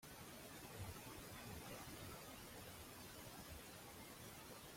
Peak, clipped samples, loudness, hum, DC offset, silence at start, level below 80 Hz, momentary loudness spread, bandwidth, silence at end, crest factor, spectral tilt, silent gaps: -40 dBFS; under 0.1%; -55 LUFS; none; under 0.1%; 0 s; -68 dBFS; 3 LU; 16.5 kHz; 0 s; 16 dB; -3.5 dB/octave; none